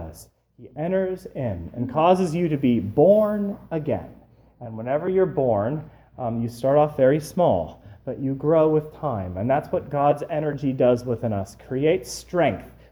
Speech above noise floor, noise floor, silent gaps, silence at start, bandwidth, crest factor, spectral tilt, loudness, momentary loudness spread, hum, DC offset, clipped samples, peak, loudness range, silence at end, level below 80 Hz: 26 dB; -48 dBFS; none; 0 s; over 20 kHz; 18 dB; -7.5 dB/octave; -23 LUFS; 12 LU; none; under 0.1%; under 0.1%; -6 dBFS; 2 LU; 0.2 s; -52 dBFS